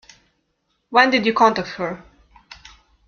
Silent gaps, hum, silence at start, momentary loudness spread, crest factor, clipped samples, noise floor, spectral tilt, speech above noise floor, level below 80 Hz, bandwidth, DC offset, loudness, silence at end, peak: none; none; 0.9 s; 13 LU; 20 dB; under 0.1%; -70 dBFS; -4.5 dB/octave; 53 dB; -56 dBFS; 7 kHz; under 0.1%; -18 LUFS; 1.1 s; -2 dBFS